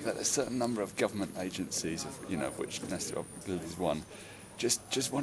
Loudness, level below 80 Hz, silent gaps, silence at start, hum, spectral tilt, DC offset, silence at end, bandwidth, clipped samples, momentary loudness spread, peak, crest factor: -34 LUFS; -62 dBFS; none; 0 s; none; -3.5 dB/octave; under 0.1%; 0 s; 11 kHz; under 0.1%; 8 LU; -14 dBFS; 20 dB